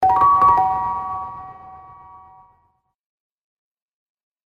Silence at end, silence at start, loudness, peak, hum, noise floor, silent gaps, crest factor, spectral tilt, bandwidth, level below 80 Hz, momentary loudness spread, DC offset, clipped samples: 2.7 s; 0 s; -17 LUFS; -4 dBFS; none; -65 dBFS; none; 18 dB; -7 dB/octave; 6.6 kHz; -50 dBFS; 22 LU; under 0.1%; under 0.1%